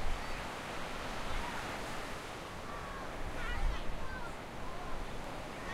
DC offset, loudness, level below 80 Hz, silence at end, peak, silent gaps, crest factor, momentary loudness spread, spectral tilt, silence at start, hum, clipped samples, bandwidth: under 0.1%; -42 LUFS; -42 dBFS; 0 s; -22 dBFS; none; 16 dB; 5 LU; -4 dB/octave; 0 s; none; under 0.1%; 15 kHz